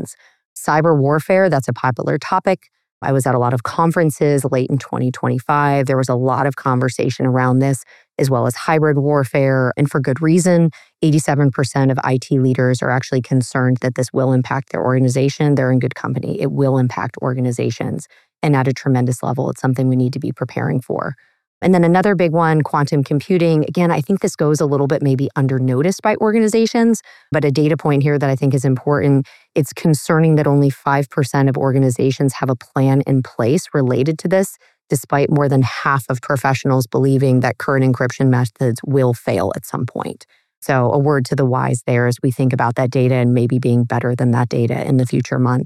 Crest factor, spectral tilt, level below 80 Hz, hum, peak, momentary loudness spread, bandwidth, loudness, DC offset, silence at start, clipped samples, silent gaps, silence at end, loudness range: 14 dB; -7 dB/octave; -60 dBFS; none; -2 dBFS; 6 LU; 14 kHz; -17 LUFS; under 0.1%; 0 s; under 0.1%; 0.45-0.56 s, 2.92-3.01 s, 21.47-21.61 s, 40.57-40.62 s; 0 s; 3 LU